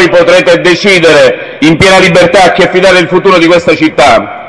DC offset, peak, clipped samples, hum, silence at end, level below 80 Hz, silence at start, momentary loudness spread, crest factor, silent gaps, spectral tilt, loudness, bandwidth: 1%; 0 dBFS; 8%; none; 0 s; -36 dBFS; 0 s; 3 LU; 4 dB; none; -4.5 dB/octave; -4 LUFS; 12 kHz